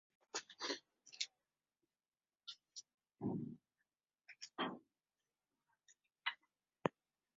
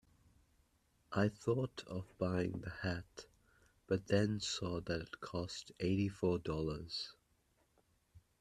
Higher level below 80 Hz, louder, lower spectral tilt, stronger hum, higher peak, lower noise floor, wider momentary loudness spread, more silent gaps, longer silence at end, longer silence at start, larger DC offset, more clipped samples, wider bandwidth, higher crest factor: second, -86 dBFS vs -64 dBFS; second, -47 LUFS vs -40 LUFS; second, -2.5 dB/octave vs -5.5 dB/octave; neither; about the same, -18 dBFS vs -20 dBFS; first, under -90 dBFS vs -76 dBFS; first, 14 LU vs 10 LU; neither; first, 0.45 s vs 0.2 s; second, 0.35 s vs 1.1 s; neither; neither; second, 7.4 kHz vs 12.5 kHz; first, 34 dB vs 22 dB